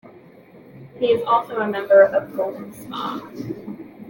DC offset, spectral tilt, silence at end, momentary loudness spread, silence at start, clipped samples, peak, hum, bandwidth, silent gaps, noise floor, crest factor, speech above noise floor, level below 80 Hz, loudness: under 0.1%; -6 dB/octave; 0 s; 18 LU; 0.05 s; under 0.1%; -4 dBFS; none; 17 kHz; none; -46 dBFS; 18 dB; 27 dB; -64 dBFS; -19 LUFS